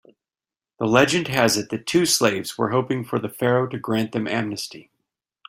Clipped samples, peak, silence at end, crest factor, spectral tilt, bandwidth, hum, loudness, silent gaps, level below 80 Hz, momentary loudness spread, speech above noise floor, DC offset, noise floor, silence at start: under 0.1%; -2 dBFS; 0.65 s; 22 dB; -4 dB/octave; 16 kHz; none; -21 LUFS; none; -60 dBFS; 10 LU; over 69 dB; under 0.1%; under -90 dBFS; 0.8 s